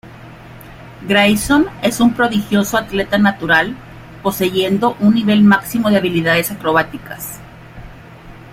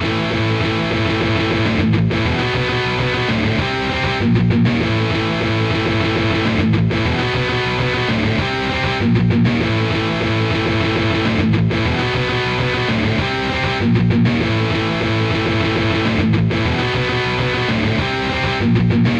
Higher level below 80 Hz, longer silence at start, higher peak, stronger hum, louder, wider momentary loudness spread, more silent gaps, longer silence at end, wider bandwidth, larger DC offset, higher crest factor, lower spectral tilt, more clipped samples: second, -42 dBFS vs -34 dBFS; about the same, 0.05 s vs 0 s; first, 0 dBFS vs -4 dBFS; neither; first, -14 LUFS vs -17 LUFS; first, 14 LU vs 3 LU; neither; about the same, 0 s vs 0 s; first, 16.5 kHz vs 8.4 kHz; neither; about the same, 16 dB vs 14 dB; second, -5 dB/octave vs -6.5 dB/octave; neither